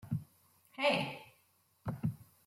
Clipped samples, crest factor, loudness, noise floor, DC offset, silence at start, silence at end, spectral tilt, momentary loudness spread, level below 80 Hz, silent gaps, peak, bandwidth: under 0.1%; 20 dB; -37 LUFS; -72 dBFS; under 0.1%; 0.05 s; 0.25 s; -6 dB/octave; 17 LU; -68 dBFS; none; -18 dBFS; 16.5 kHz